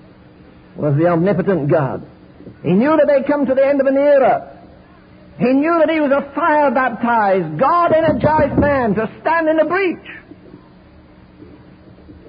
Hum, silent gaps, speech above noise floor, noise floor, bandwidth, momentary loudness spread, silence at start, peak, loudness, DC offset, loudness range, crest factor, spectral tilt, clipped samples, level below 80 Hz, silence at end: none; none; 29 dB; -44 dBFS; 5.2 kHz; 8 LU; 0.75 s; -4 dBFS; -15 LUFS; under 0.1%; 3 LU; 12 dB; -12.5 dB/octave; under 0.1%; -42 dBFS; 0.1 s